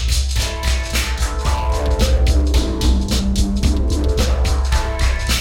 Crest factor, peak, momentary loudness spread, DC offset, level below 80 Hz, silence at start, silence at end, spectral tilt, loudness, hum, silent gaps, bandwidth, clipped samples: 14 dB; -4 dBFS; 4 LU; under 0.1%; -18 dBFS; 0 s; 0 s; -4.5 dB/octave; -18 LUFS; none; none; 16.5 kHz; under 0.1%